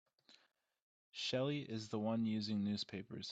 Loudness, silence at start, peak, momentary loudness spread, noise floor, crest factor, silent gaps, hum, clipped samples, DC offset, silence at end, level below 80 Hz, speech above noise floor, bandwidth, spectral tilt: -41 LUFS; 0.3 s; -28 dBFS; 7 LU; -74 dBFS; 16 dB; 0.82-1.12 s; none; under 0.1%; under 0.1%; 0 s; -80 dBFS; 34 dB; 8 kHz; -5.5 dB/octave